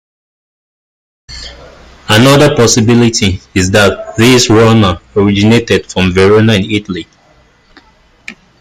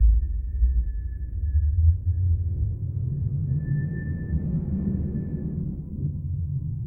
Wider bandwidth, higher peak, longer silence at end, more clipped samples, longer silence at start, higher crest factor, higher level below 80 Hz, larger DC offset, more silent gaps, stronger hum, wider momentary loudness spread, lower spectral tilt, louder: first, 16.5 kHz vs 1.9 kHz; first, 0 dBFS vs -10 dBFS; first, 0.3 s vs 0 s; neither; first, 1.3 s vs 0 s; about the same, 10 dB vs 14 dB; second, -38 dBFS vs -26 dBFS; neither; neither; neither; first, 16 LU vs 8 LU; second, -5 dB/octave vs -14 dB/octave; first, -8 LUFS vs -27 LUFS